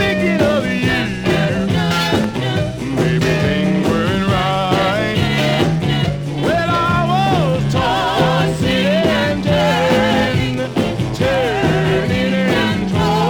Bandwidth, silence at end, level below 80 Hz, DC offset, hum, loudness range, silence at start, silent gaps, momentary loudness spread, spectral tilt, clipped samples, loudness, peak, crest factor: 19 kHz; 0 s; -36 dBFS; under 0.1%; none; 1 LU; 0 s; none; 4 LU; -6 dB/octave; under 0.1%; -16 LUFS; -2 dBFS; 14 dB